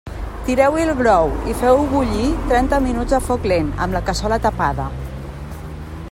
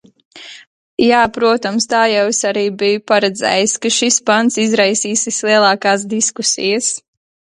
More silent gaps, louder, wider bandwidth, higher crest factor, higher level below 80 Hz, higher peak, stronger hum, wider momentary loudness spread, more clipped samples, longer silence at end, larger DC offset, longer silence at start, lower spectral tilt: second, none vs 0.67-0.97 s; second, -18 LUFS vs -14 LUFS; first, 16.5 kHz vs 11.5 kHz; about the same, 16 dB vs 16 dB; first, -28 dBFS vs -56 dBFS; about the same, -2 dBFS vs 0 dBFS; neither; first, 16 LU vs 5 LU; neither; second, 0 s vs 0.6 s; neither; second, 0.05 s vs 0.35 s; first, -6 dB/octave vs -2 dB/octave